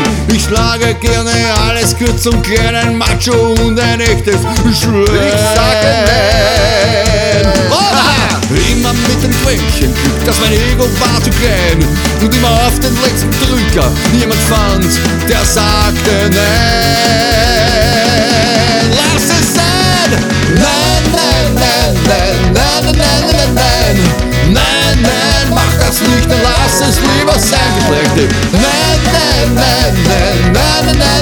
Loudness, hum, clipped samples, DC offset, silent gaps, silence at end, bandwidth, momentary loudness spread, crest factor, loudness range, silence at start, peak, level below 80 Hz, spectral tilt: -9 LUFS; none; under 0.1%; under 0.1%; none; 0 s; over 20 kHz; 2 LU; 10 dB; 2 LU; 0 s; 0 dBFS; -18 dBFS; -4 dB/octave